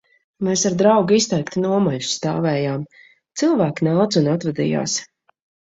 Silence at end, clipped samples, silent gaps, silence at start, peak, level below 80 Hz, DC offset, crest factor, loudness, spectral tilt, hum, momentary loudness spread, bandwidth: 0.7 s; under 0.1%; none; 0.4 s; -2 dBFS; -58 dBFS; under 0.1%; 18 dB; -19 LUFS; -5 dB/octave; none; 9 LU; 8 kHz